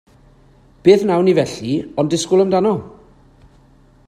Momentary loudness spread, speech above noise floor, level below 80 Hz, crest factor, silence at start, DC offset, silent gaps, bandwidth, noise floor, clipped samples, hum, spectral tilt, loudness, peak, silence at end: 9 LU; 34 dB; -52 dBFS; 18 dB; 0.85 s; under 0.1%; none; 11.5 kHz; -49 dBFS; under 0.1%; none; -6 dB/octave; -16 LUFS; 0 dBFS; 1.2 s